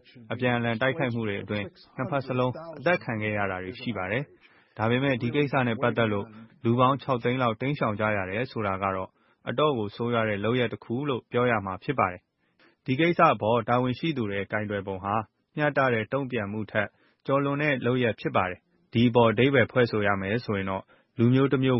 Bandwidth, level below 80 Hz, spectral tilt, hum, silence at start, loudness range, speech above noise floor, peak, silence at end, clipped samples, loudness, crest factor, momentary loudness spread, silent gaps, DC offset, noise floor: 5.8 kHz; -62 dBFS; -11 dB/octave; none; 0.15 s; 4 LU; 38 dB; -6 dBFS; 0 s; under 0.1%; -26 LUFS; 20 dB; 11 LU; none; under 0.1%; -64 dBFS